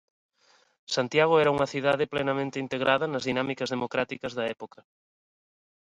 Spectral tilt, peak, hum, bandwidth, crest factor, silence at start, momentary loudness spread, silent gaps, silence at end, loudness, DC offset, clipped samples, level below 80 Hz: -5 dB/octave; -8 dBFS; none; 10.5 kHz; 20 dB; 0.9 s; 10 LU; none; 1.25 s; -27 LUFS; under 0.1%; under 0.1%; -66 dBFS